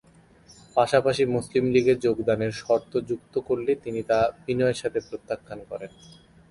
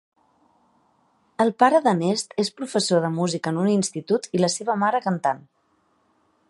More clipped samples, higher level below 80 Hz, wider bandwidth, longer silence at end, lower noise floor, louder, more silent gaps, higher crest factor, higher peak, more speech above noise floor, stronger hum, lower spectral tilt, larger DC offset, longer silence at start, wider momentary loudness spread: neither; first, -56 dBFS vs -72 dBFS; about the same, 11.5 kHz vs 11.5 kHz; second, 0.65 s vs 1.1 s; second, -54 dBFS vs -66 dBFS; second, -25 LUFS vs -22 LUFS; neither; about the same, 18 dB vs 20 dB; about the same, -6 dBFS vs -4 dBFS; second, 30 dB vs 44 dB; neither; about the same, -6 dB/octave vs -5 dB/octave; neither; second, 0.75 s vs 1.4 s; first, 13 LU vs 8 LU